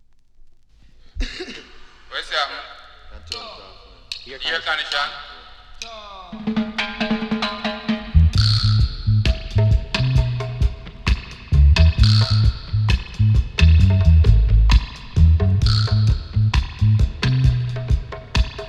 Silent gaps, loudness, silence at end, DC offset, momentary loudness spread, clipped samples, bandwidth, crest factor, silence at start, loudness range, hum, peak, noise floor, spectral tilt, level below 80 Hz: none; -19 LUFS; 0 s; under 0.1%; 18 LU; under 0.1%; 9.4 kHz; 16 dB; 1.15 s; 12 LU; none; -2 dBFS; -47 dBFS; -6 dB/octave; -22 dBFS